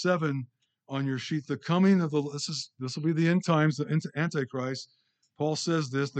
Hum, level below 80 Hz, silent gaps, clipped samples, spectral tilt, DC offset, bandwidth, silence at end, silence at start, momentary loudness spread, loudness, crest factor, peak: none; -78 dBFS; none; under 0.1%; -6 dB/octave; under 0.1%; 9 kHz; 0 s; 0 s; 12 LU; -29 LUFS; 16 dB; -12 dBFS